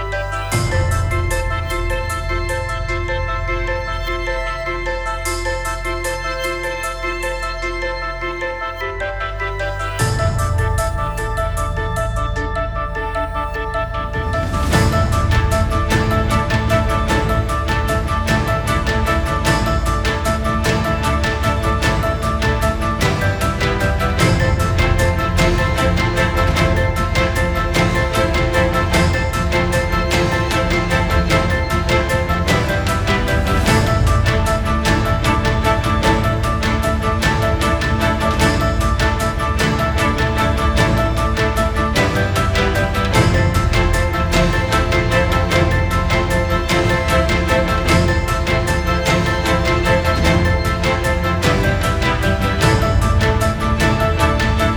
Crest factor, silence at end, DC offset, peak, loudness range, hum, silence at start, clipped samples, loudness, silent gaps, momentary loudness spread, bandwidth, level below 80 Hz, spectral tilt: 16 dB; 0 s; under 0.1%; -2 dBFS; 6 LU; none; 0 s; under 0.1%; -17 LUFS; none; 7 LU; over 20 kHz; -24 dBFS; -5.5 dB/octave